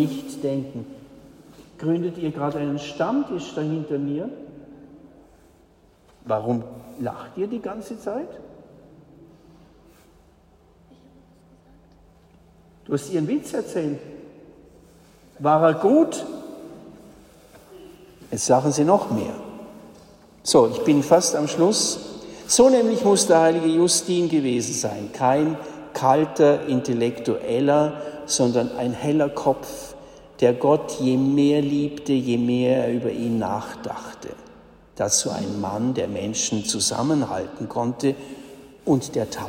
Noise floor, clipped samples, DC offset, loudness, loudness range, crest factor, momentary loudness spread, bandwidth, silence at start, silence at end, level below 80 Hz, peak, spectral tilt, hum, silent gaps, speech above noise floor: -55 dBFS; under 0.1%; under 0.1%; -22 LUFS; 12 LU; 20 dB; 17 LU; 16 kHz; 0 s; 0 s; -58 dBFS; -4 dBFS; -4.5 dB/octave; none; none; 34 dB